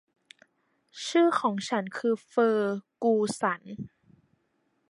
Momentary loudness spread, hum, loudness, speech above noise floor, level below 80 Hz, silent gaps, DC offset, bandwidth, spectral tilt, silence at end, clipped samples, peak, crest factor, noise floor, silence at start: 13 LU; none; -27 LUFS; 47 dB; -74 dBFS; none; under 0.1%; 11.5 kHz; -5 dB/octave; 1.05 s; under 0.1%; -12 dBFS; 18 dB; -74 dBFS; 0.95 s